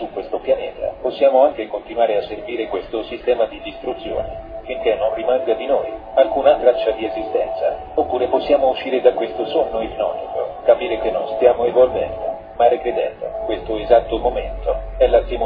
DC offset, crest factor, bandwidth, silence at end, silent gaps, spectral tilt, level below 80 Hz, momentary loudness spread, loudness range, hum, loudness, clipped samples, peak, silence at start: under 0.1%; 18 dB; 5 kHz; 0 s; none; -8.5 dB/octave; -38 dBFS; 10 LU; 4 LU; none; -19 LUFS; under 0.1%; 0 dBFS; 0 s